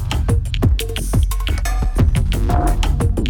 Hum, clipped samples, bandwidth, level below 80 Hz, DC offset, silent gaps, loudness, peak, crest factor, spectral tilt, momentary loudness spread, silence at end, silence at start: none; under 0.1%; 18 kHz; -18 dBFS; under 0.1%; none; -19 LUFS; -4 dBFS; 12 dB; -6 dB/octave; 4 LU; 0 s; 0 s